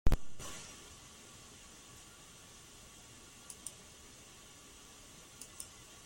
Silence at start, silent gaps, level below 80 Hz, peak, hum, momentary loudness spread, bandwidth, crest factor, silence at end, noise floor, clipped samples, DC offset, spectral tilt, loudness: 0.05 s; none; -44 dBFS; -14 dBFS; none; 7 LU; 16.5 kHz; 24 dB; 0.4 s; -56 dBFS; under 0.1%; under 0.1%; -4 dB/octave; -50 LUFS